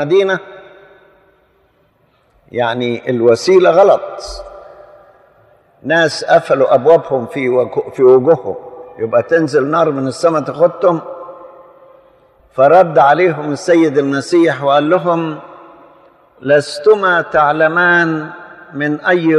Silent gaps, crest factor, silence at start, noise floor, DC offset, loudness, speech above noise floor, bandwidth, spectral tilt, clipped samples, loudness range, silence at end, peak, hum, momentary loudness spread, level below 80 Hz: none; 14 dB; 0 s; -56 dBFS; under 0.1%; -12 LUFS; 44 dB; 11.5 kHz; -6 dB/octave; under 0.1%; 3 LU; 0 s; 0 dBFS; none; 17 LU; -52 dBFS